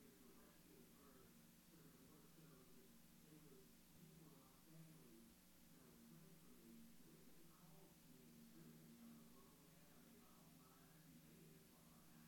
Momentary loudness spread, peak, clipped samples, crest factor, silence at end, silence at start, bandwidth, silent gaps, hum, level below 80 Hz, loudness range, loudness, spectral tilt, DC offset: 3 LU; -52 dBFS; under 0.1%; 14 dB; 0 s; 0 s; 17 kHz; none; none; -82 dBFS; 1 LU; -67 LUFS; -4.5 dB/octave; under 0.1%